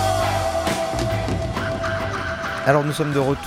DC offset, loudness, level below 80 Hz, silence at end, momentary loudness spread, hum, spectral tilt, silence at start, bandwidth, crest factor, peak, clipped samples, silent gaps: under 0.1%; -22 LUFS; -38 dBFS; 0 s; 6 LU; none; -5.5 dB/octave; 0 s; 16 kHz; 18 dB; -2 dBFS; under 0.1%; none